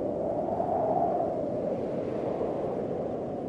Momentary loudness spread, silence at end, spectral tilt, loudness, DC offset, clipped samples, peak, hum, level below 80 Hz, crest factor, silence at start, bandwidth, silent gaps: 5 LU; 0 s; -9.5 dB/octave; -30 LUFS; under 0.1%; under 0.1%; -16 dBFS; none; -58 dBFS; 14 dB; 0 s; 9.2 kHz; none